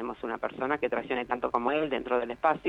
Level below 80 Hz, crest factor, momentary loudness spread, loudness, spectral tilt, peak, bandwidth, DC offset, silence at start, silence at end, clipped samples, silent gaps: -60 dBFS; 18 dB; 6 LU; -30 LUFS; -6.5 dB/octave; -12 dBFS; 7.8 kHz; under 0.1%; 0 s; 0 s; under 0.1%; none